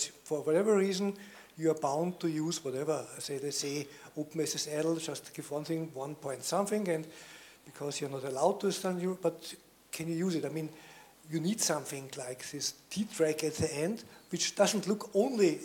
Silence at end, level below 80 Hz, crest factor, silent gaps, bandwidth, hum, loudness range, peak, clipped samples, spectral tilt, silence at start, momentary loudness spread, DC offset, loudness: 0 s; -72 dBFS; 20 dB; none; 17.5 kHz; none; 4 LU; -14 dBFS; under 0.1%; -4 dB/octave; 0 s; 14 LU; under 0.1%; -33 LUFS